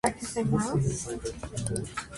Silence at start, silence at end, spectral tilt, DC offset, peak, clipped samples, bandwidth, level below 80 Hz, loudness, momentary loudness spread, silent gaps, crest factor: 0.05 s; 0 s; -5.5 dB/octave; under 0.1%; -8 dBFS; under 0.1%; 11.5 kHz; -48 dBFS; -31 LUFS; 9 LU; none; 22 dB